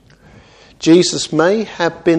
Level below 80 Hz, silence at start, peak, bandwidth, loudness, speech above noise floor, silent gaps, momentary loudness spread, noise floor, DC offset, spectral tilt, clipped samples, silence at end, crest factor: -52 dBFS; 0.8 s; 0 dBFS; 10 kHz; -14 LUFS; 31 dB; none; 8 LU; -44 dBFS; under 0.1%; -4.5 dB/octave; under 0.1%; 0 s; 16 dB